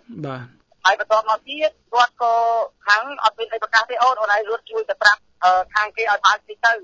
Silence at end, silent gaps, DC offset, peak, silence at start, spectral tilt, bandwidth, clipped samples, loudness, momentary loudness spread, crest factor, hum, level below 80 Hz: 0 s; none; under 0.1%; 0 dBFS; 0.1 s; -2 dB/octave; 8 kHz; under 0.1%; -19 LUFS; 9 LU; 20 dB; none; -64 dBFS